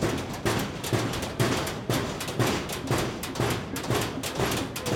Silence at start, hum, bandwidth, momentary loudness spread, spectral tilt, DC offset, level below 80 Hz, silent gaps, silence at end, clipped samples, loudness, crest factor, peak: 0 s; none; 18.5 kHz; 4 LU; -4.5 dB/octave; under 0.1%; -46 dBFS; none; 0 s; under 0.1%; -28 LUFS; 18 dB; -10 dBFS